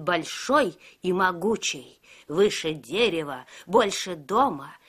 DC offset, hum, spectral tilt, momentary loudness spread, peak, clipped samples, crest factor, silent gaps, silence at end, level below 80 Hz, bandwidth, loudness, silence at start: under 0.1%; none; -3.5 dB/octave; 8 LU; -6 dBFS; under 0.1%; 20 dB; none; 0.1 s; -62 dBFS; 15.5 kHz; -25 LUFS; 0 s